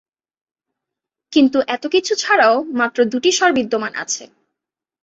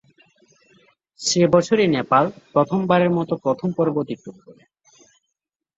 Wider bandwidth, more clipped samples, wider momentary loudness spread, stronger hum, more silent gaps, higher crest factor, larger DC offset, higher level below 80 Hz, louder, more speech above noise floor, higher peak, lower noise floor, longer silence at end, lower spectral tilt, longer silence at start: about the same, 8.2 kHz vs 8 kHz; neither; about the same, 9 LU vs 10 LU; neither; neither; about the same, 16 dB vs 20 dB; neither; about the same, -64 dBFS vs -60 dBFS; about the same, -17 LUFS vs -19 LUFS; first, 67 dB vs 62 dB; about the same, -2 dBFS vs -2 dBFS; about the same, -83 dBFS vs -82 dBFS; second, 0.8 s vs 1.25 s; second, -2 dB/octave vs -5.5 dB/octave; about the same, 1.3 s vs 1.2 s